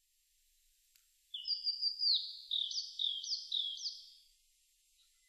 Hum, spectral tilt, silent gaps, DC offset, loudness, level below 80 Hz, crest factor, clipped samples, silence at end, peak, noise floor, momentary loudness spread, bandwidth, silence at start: none; 7 dB/octave; none; under 0.1%; -35 LUFS; -82 dBFS; 20 dB; under 0.1%; 1.1 s; -22 dBFS; -75 dBFS; 12 LU; 14 kHz; 1.35 s